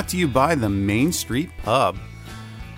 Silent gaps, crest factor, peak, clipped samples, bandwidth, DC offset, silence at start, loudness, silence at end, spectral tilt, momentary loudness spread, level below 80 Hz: none; 18 dB; -4 dBFS; under 0.1%; 16 kHz; under 0.1%; 0 s; -21 LUFS; 0 s; -5 dB/octave; 18 LU; -42 dBFS